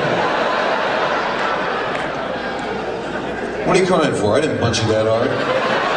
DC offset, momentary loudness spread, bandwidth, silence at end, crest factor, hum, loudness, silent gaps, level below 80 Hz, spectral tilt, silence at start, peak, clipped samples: under 0.1%; 7 LU; 10 kHz; 0 s; 16 dB; none; -18 LUFS; none; -46 dBFS; -5 dB/octave; 0 s; -2 dBFS; under 0.1%